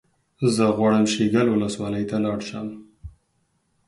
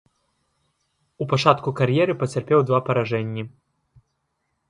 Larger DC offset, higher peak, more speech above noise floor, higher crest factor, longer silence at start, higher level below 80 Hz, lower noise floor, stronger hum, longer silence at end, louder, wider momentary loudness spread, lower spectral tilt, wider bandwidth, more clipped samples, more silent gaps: neither; second, -6 dBFS vs 0 dBFS; second, 48 dB vs 54 dB; second, 16 dB vs 24 dB; second, 0.4 s vs 1.2 s; first, -52 dBFS vs -62 dBFS; second, -69 dBFS vs -74 dBFS; neither; second, 0.8 s vs 1.2 s; about the same, -22 LUFS vs -21 LUFS; about the same, 13 LU vs 13 LU; about the same, -5.5 dB/octave vs -6.5 dB/octave; about the same, 11.5 kHz vs 11 kHz; neither; neither